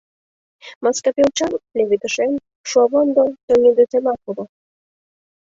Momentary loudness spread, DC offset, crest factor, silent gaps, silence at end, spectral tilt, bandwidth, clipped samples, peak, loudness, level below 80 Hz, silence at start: 12 LU; under 0.1%; 16 dB; 0.75-0.81 s, 2.55-2.64 s, 3.43-3.48 s; 1 s; -3.5 dB/octave; 7.8 kHz; under 0.1%; -4 dBFS; -17 LUFS; -58 dBFS; 0.65 s